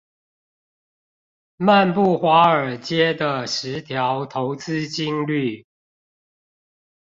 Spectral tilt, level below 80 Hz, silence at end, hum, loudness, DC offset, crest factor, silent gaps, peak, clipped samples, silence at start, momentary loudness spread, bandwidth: -5.5 dB/octave; -64 dBFS; 1.45 s; none; -20 LUFS; under 0.1%; 18 dB; none; -2 dBFS; under 0.1%; 1.6 s; 11 LU; 7.8 kHz